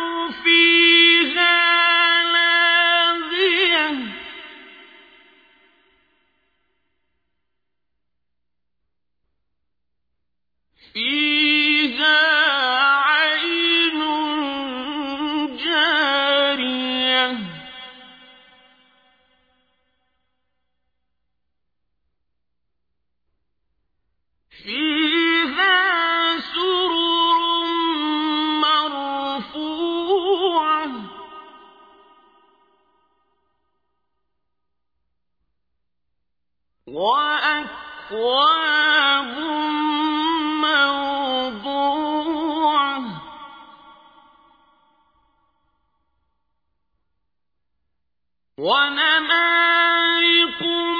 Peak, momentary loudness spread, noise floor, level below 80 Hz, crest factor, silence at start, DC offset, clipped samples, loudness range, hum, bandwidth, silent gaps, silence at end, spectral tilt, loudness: -4 dBFS; 13 LU; -82 dBFS; -64 dBFS; 18 dB; 0 s; under 0.1%; under 0.1%; 10 LU; none; 5 kHz; none; 0 s; -4 dB/octave; -17 LUFS